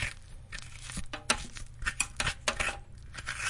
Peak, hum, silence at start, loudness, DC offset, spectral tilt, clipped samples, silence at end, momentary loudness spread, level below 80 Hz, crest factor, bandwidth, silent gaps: -10 dBFS; none; 0 s; -34 LUFS; under 0.1%; -1.5 dB/octave; under 0.1%; 0 s; 14 LU; -44 dBFS; 26 dB; 11.5 kHz; none